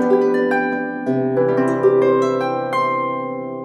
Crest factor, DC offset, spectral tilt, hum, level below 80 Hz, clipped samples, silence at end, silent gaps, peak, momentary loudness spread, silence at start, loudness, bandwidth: 14 dB; under 0.1%; -7.5 dB/octave; none; -66 dBFS; under 0.1%; 0 s; none; -4 dBFS; 7 LU; 0 s; -18 LUFS; 9 kHz